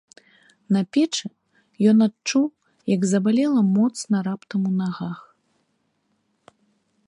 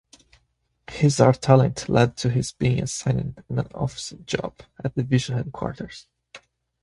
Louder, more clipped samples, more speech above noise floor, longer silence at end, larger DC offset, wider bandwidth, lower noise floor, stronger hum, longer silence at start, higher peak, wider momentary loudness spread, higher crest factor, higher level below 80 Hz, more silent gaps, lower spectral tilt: about the same, -22 LUFS vs -23 LUFS; neither; about the same, 50 dB vs 47 dB; first, 1.9 s vs 0.45 s; neither; about the same, 11 kHz vs 11.5 kHz; about the same, -70 dBFS vs -69 dBFS; neither; second, 0.7 s vs 0.9 s; second, -6 dBFS vs -2 dBFS; second, 12 LU vs 16 LU; second, 16 dB vs 22 dB; second, -72 dBFS vs -48 dBFS; neither; about the same, -6 dB/octave vs -6 dB/octave